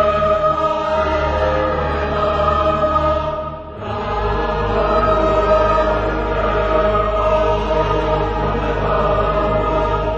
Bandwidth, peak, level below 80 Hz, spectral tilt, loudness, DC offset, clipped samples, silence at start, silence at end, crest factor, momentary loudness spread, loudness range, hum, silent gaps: 8 kHz; -4 dBFS; -26 dBFS; -7 dB/octave; -17 LUFS; under 0.1%; under 0.1%; 0 s; 0 s; 14 dB; 5 LU; 2 LU; none; none